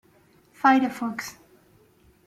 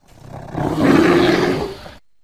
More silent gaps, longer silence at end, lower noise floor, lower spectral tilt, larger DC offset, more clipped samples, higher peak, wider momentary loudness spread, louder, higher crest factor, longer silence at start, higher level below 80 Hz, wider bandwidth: neither; first, 0.95 s vs 0.3 s; first, -59 dBFS vs -39 dBFS; second, -4 dB/octave vs -6 dB/octave; second, under 0.1% vs 0.4%; neither; second, -8 dBFS vs -2 dBFS; second, 16 LU vs 20 LU; second, -23 LUFS vs -15 LUFS; about the same, 20 dB vs 16 dB; first, 0.65 s vs 0.3 s; second, -68 dBFS vs -42 dBFS; about the same, 15 kHz vs 14.5 kHz